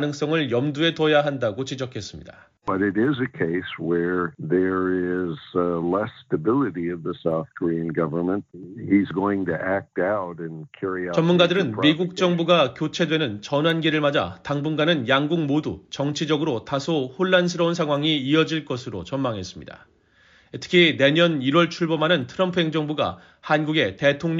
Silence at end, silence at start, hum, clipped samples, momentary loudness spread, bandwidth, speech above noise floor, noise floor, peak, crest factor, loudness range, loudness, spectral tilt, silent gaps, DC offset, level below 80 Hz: 0 s; 0 s; none; under 0.1%; 11 LU; 7.6 kHz; 34 dB; -57 dBFS; -4 dBFS; 18 dB; 4 LU; -22 LUFS; -4 dB/octave; none; under 0.1%; -60 dBFS